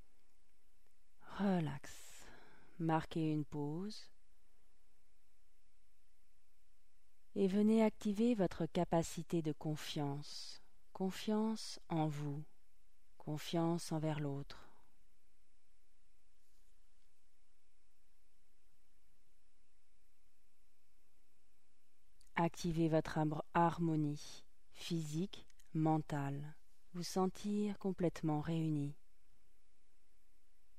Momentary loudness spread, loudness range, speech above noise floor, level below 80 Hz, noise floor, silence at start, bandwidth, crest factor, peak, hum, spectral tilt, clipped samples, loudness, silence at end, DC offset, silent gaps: 16 LU; 9 LU; 43 dB; -66 dBFS; -81 dBFS; 1.25 s; 15 kHz; 20 dB; -22 dBFS; none; -6.5 dB/octave; under 0.1%; -39 LUFS; 1.85 s; 0.3%; none